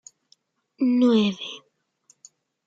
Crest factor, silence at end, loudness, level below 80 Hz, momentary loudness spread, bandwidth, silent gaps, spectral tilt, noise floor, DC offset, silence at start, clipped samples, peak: 16 dB; 1.1 s; -22 LUFS; -76 dBFS; 17 LU; 7.8 kHz; none; -6 dB/octave; -64 dBFS; under 0.1%; 0.8 s; under 0.1%; -10 dBFS